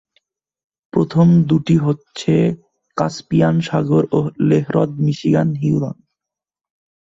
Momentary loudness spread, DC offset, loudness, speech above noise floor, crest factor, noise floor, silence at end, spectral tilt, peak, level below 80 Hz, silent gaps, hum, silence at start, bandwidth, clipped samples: 9 LU; under 0.1%; -17 LUFS; 71 dB; 14 dB; -86 dBFS; 1.1 s; -8 dB/octave; -2 dBFS; -52 dBFS; none; none; 0.95 s; 7.8 kHz; under 0.1%